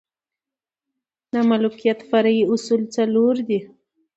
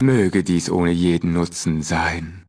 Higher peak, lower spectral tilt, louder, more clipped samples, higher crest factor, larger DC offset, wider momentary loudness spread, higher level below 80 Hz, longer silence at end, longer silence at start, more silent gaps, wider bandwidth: about the same, -4 dBFS vs -6 dBFS; about the same, -6 dB/octave vs -6 dB/octave; about the same, -20 LUFS vs -20 LUFS; neither; about the same, 16 dB vs 14 dB; neither; about the same, 6 LU vs 4 LU; second, -70 dBFS vs -40 dBFS; first, 0.5 s vs 0.1 s; first, 1.35 s vs 0 s; neither; second, 8 kHz vs 11 kHz